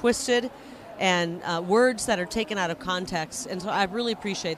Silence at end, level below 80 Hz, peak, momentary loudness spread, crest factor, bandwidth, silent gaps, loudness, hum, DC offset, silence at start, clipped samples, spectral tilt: 0 s; -56 dBFS; -8 dBFS; 10 LU; 18 dB; 15.5 kHz; none; -26 LUFS; none; under 0.1%; 0 s; under 0.1%; -3.5 dB/octave